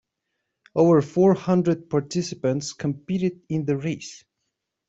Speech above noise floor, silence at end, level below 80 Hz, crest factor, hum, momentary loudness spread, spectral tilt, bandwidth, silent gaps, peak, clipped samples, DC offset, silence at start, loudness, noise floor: 57 dB; 0.7 s; -62 dBFS; 18 dB; none; 11 LU; -7 dB/octave; 8 kHz; none; -6 dBFS; under 0.1%; under 0.1%; 0.75 s; -23 LUFS; -80 dBFS